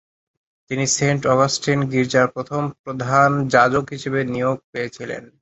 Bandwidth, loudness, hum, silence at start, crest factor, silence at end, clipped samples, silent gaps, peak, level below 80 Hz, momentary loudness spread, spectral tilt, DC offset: 8.2 kHz; -19 LUFS; none; 0.7 s; 18 dB; 0.15 s; under 0.1%; 2.79-2.84 s, 4.64-4.73 s; -2 dBFS; -54 dBFS; 12 LU; -4.5 dB/octave; under 0.1%